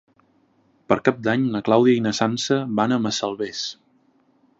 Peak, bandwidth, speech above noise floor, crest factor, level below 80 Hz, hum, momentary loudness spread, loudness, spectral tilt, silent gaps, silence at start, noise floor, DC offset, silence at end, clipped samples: -2 dBFS; 8 kHz; 41 dB; 22 dB; -62 dBFS; none; 10 LU; -21 LUFS; -5 dB/octave; none; 0.9 s; -61 dBFS; under 0.1%; 0.85 s; under 0.1%